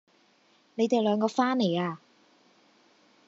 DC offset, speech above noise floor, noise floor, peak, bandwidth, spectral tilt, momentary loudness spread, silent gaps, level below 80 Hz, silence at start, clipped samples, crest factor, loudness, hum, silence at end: under 0.1%; 38 dB; -64 dBFS; -10 dBFS; 7.8 kHz; -5 dB/octave; 13 LU; none; -86 dBFS; 0.75 s; under 0.1%; 20 dB; -27 LUFS; none; 1.3 s